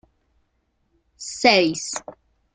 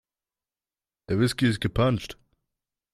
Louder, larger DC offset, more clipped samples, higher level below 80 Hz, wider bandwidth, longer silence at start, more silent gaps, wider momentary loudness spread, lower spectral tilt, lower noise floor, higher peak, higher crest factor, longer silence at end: first, -19 LUFS vs -25 LUFS; neither; neither; second, -62 dBFS vs -48 dBFS; second, 9.6 kHz vs 14 kHz; about the same, 1.2 s vs 1.1 s; neither; first, 18 LU vs 8 LU; second, -2.5 dB/octave vs -6 dB/octave; second, -70 dBFS vs under -90 dBFS; first, -2 dBFS vs -10 dBFS; first, 24 dB vs 18 dB; second, 0.45 s vs 0.8 s